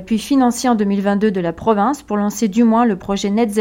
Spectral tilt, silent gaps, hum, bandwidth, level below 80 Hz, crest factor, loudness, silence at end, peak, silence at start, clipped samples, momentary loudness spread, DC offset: -5.5 dB/octave; none; none; 16.5 kHz; -46 dBFS; 14 dB; -16 LUFS; 0 s; -2 dBFS; 0 s; under 0.1%; 5 LU; under 0.1%